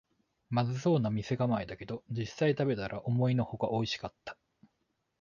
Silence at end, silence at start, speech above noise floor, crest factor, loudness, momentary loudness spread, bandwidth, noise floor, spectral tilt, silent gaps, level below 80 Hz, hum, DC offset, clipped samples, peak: 0.9 s; 0.5 s; 48 dB; 16 dB; -32 LUFS; 11 LU; 7.2 kHz; -80 dBFS; -7 dB/octave; none; -62 dBFS; none; under 0.1%; under 0.1%; -16 dBFS